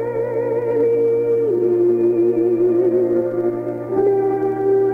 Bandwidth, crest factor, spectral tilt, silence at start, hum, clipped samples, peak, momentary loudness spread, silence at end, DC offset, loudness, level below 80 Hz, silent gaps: 2.7 kHz; 10 dB; -10.5 dB/octave; 0 s; none; under 0.1%; -8 dBFS; 5 LU; 0 s; under 0.1%; -18 LUFS; -60 dBFS; none